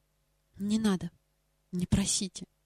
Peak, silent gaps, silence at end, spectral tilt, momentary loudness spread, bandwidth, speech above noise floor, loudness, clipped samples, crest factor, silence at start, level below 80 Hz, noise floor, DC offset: -14 dBFS; none; 0.2 s; -4.5 dB/octave; 12 LU; 15.5 kHz; 44 dB; -31 LUFS; under 0.1%; 18 dB; 0.55 s; -48 dBFS; -74 dBFS; under 0.1%